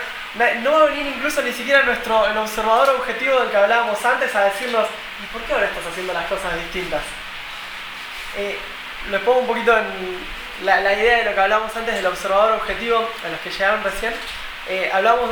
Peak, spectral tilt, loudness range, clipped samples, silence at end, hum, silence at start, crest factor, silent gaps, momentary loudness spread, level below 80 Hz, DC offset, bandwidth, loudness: -2 dBFS; -2.5 dB/octave; 7 LU; under 0.1%; 0 s; none; 0 s; 18 dB; none; 14 LU; -44 dBFS; under 0.1%; over 20 kHz; -19 LUFS